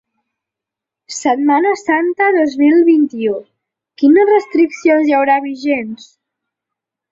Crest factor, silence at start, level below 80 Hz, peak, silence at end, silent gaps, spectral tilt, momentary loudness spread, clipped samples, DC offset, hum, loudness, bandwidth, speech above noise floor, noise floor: 12 dB; 1.1 s; -62 dBFS; -2 dBFS; 1.15 s; none; -4.5 dB/octave; 9 LU; under 0.1%; under 0.1%; none; -13 LUFS; 7.8 kHz; 72 dB; -84 dBFS